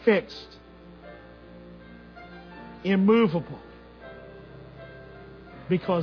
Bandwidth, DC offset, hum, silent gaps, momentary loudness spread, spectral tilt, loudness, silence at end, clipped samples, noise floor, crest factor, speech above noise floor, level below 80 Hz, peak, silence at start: 5.4 kHz; under 0.1%; none; none; 26 LU; -8.5 dB/octave; -24 LUFS; 0 s; under 0.1%; -48 dBFS; 20 dB; 25 dB; -56 dBFS; -8 dBFS; 0.05 s